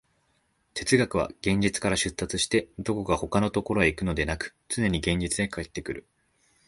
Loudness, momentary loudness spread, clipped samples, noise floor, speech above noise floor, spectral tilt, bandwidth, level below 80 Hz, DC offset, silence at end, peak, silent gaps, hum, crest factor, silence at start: -27 LUFS; 10 LU; under 0.1%; -70 dBFS; 44 dB; -4.5 dB/octave; 11.5 kHz; -44 dBFS; under 0.1%; 0.65 s; -6 dBFS; none; none; 22 dB; 0.75 s